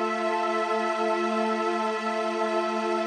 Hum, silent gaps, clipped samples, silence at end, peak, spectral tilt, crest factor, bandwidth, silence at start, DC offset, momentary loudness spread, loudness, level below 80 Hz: none; none; under 0.1%; 0 s; -14 dBFS; -4 dB/octave; 12 dB; 11 kHz; 0 s; under 0.1%; 2 LU; -26 LUFS; -86 dBFS